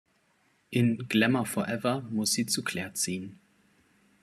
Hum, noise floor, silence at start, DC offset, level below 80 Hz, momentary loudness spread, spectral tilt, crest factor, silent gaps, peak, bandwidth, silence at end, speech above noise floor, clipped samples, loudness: none; -69 dBFS; 0.7 s; under 0.1%; -70 dBFS; 8 LU; -4 dB/octave; 20 dB; none; -10 dBFS; 14 kHz; 0.9 s; 40 dB; under 0.1%; -28 LUFS